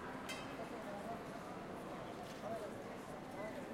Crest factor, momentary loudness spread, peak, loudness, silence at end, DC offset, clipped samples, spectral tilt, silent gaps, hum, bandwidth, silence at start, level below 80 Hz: 16 dB; 3 LU; -30 dBFS; -48 LUFS; 0 s; under 0.1%; under 0.1%; -5 dB/octave; none; none; 16 kHz; 0 s; -68 dBFS